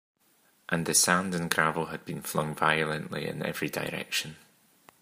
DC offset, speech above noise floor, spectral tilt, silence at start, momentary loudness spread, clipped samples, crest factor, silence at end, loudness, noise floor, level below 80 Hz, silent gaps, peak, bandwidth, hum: under 0.1%; 37 dB; -3 dB/octave; 0.7 s; 12 LU; under 0.1%; 28 dB; 0.65 s; -28 LUFS; -66 dBFS; -66 dBFS; none; -4 dBFS; 15.5 kHz; none